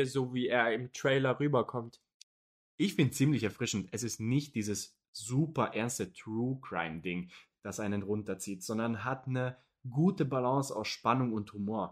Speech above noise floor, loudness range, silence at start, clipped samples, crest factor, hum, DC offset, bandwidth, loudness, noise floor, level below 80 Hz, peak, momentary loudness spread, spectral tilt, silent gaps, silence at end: over 57 dB; 4 LU; 0 s; under 0.1%; 20 dB; none; under 0.1%; 15.5 kHz; -33 LUFS; under -90 dBFS; -70 dBFS; -12 dBFS; 10 LU; -5.5 dB/octave; 2.14-2.78 s, 5.08-5.13 s; 0 s